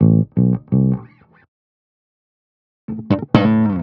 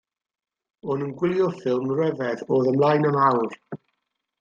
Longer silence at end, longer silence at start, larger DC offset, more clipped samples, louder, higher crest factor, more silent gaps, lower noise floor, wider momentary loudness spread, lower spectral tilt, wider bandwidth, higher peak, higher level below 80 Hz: second, 0 s vs 0.65 s; second, 0 s vs 0.85 s; neither; neither; first, -17 LUFS vs -23 LUFS; about the same, 18 dB vs 18 dB; first, 1.48-2.88 s vs none; second, -42 dBFS vs -79 dBFS; second, 12 LU vs 17 LU; about the same, -8.5 dB/octave vs -8.5 dB/octave; second, 5.6 kHz vs 7.4 kHz; first, 0 dBFS vs -6 dBFS; first, -46 dBFS vs -68 dBFS